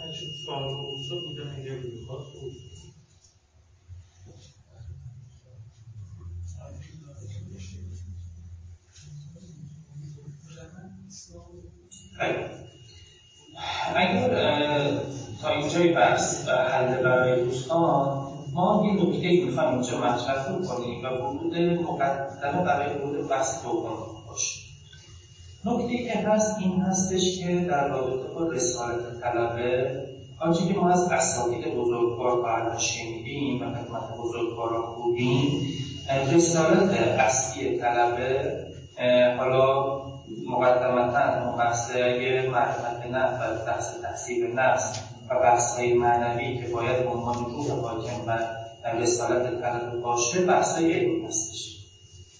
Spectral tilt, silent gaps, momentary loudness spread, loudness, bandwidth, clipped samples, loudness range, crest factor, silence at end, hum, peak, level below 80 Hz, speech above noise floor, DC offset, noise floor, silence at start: -4.5 dB/octave; none; 20 LU; -26 LUFS; 8 kHz; under 0.1%; 19 LU; 18 dB; 0.15 s; none; -8 dBFS; -52 dBFS; 34 dB; under 0.1%; -59 dBFS; 0 s